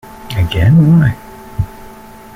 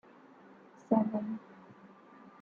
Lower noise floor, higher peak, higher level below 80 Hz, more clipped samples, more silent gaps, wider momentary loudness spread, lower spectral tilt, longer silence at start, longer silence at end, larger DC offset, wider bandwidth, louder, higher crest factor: second, -34 dBFS vs -57 dBFS; first, -2 dBFS vs -14 dBFS; first, -30 dBFS vs -82 dBFS; neither; neither; second, 17 LU vs 27 LU; second, -8 dB/octave vs -10 dB/octave; second, 0.15 s vs 0.9 s; first, 0.5 s vs 0.15 s; neither; first, 15 kHz vs 6.8 kHz; first, -12 LUFS vs -33 LUFS; second, 12 dB vs 22 dB